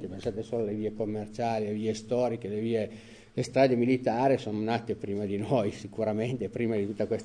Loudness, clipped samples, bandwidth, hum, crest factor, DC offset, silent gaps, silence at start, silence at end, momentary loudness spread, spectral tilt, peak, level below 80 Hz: -30 LUFS; under 0.1%; 10 kHz; none; 20 dB; under 0.1%; none; 0 s; 0 s; 8 LU; -7 dB/octave; -10 dBFS; -60 dBFS